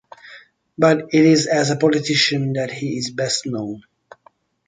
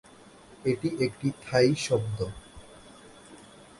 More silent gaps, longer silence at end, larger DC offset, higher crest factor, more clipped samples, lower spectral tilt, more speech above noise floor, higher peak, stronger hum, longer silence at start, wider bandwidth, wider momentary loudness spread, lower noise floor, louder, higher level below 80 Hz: neither; first, 0.9 s vs 0.15 s; neither; about the same, 18 dB vs 20 dB; neither; about the same, -4.5 dB/octave vs -5.5 dB/octave; first, 38 dB vs 25 dB; first, -2 dBFS vs -10 dBFS; neither; second, 0.25 s vs 0.5 s; second, 9.6 kHz vs 11.5 kHz; second, 12 LU vs 26 LU; first, -56 dBFS vs -52 dBFS; first, -18 LUFS vs -28 LUFS; second, -62 dBFS vs -56 dBFS